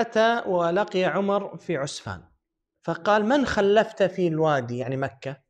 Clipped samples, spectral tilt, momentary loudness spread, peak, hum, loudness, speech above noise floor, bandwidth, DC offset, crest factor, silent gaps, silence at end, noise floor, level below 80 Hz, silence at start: under 0.1%; -5.5 dB/octave; 11 LU; -8 dBFS; none; -24 LUFS; 52 dB; 10 kHz; under 0.1%; 16 dB; none; 0.15 s; -75 dBFS; -56 dBFS; 0 s